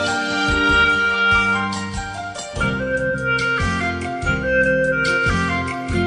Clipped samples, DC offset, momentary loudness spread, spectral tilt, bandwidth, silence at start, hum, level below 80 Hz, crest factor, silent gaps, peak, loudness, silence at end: under 0.1%; under 0.1%; 9 LU; -4.5 dB/octave; 10 kHz; 0 s; none; -34 dBFS; 14 dB; none; -4 dBFS; -18 LUFS; 0 s